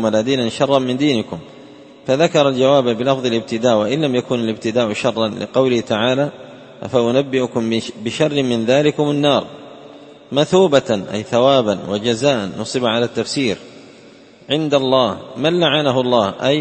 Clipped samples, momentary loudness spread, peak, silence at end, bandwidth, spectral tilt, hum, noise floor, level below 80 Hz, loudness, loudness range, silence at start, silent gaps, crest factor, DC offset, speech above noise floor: under 0.1%; 7 LU; 0 dBFS; 0 s; 8.8 kHz; -5.5 dB/octave; none; -43 dBFS; -56 dBFS; -17 LUFS; 2 LU; 0 s; none; 16 dB; under 0.1%; 27 dB